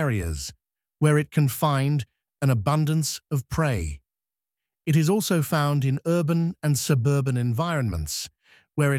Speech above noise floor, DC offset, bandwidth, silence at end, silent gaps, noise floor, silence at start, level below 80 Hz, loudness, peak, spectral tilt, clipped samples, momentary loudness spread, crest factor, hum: over 67 dB; under 0.1%; 16.5 kHz; 0 s; none; under -90 dBFS; 0 s; -44 dBFS; -24 LUFS; -8 dBFS; -6 dB/octave; under 0.1%; 10 LU; 16 dB; none